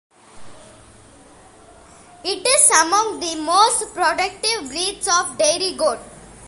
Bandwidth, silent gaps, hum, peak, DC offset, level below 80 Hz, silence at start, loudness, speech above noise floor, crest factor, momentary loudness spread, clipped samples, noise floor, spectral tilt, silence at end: 12 kHz; none; none; 0 dBFS; under 0.1%; -54 dBFS; 0.35 s; -17 LUFS; 28 dB; 20 dB; 11 LU; under 0.1%; -46 dBFS; 0 dB/octave; 0 s